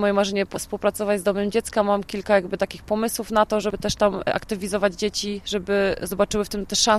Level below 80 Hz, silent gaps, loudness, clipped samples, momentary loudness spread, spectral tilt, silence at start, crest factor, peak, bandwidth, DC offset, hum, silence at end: -46 dBFS; none; -23 LUFS; under 0.1%; 6 LU; -3.5 dB/octave; 0 s; 18 dB; -4 dBFS; 15.5 kHz; under 0.1%; none; 0 s